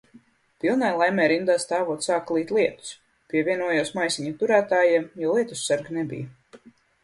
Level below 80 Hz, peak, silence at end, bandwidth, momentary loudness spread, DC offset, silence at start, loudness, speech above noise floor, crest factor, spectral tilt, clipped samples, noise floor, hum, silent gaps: -68 dBFS; -6 dBFS; 0.5 s; 11.5 kHz; 10 LU; under 0.1%; 0.65 s; -23 LUFS; 32 dB; 18 dB; -4 dB/octave; under 0.1%; -55 dBFS; none; none